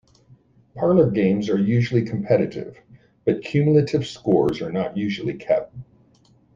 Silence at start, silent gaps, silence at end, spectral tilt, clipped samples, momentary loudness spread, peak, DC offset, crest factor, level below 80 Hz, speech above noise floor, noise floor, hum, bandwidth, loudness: 0.75 s; none; 0.75 s; -8 dB/octave; under 0.1%; 9 LU; -4 dBFS; under 0.1%; 18 dB; -54 dBFS; 36 dB; -57 dBFS; none; 7.6 kHz; -21 LUFS